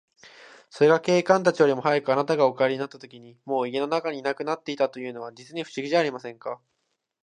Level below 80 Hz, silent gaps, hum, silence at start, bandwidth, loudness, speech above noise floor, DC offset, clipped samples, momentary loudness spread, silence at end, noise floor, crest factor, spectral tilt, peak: -76 dBFS; none; none; 0.75 s; 10 kHz; -24 LUFS; 53 dB; under 0.1%; under 0.1%; 16 LU; 0.7 s; -77 dBFS; 22 dB; -5.5 dB/octave; -4 dBFS